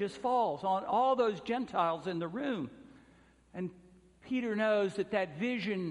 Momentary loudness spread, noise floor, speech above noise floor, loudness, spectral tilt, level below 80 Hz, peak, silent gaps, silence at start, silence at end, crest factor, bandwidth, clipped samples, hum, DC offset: 13 LU; -63 dBFS; 30 dB; -33 LUFS; -6.5 dB/octave; -70 dBFS; -16 dBFS; none; 0 s; 0 s; 18 dB; 11 kHz; under 0.1%; none; under 0.1%